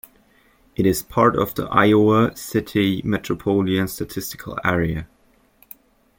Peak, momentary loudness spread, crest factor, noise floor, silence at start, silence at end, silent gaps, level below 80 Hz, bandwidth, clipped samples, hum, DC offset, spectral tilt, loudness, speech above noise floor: -2 dBFS; 13 LU; 20 dB; -58 dBFS; 0.8 s; 1.15 s; none; -46 dBFS; 17 kHz; under 0.1%; none; under 0.1%; -6 dB/octave; -20 LUFS; 39 dB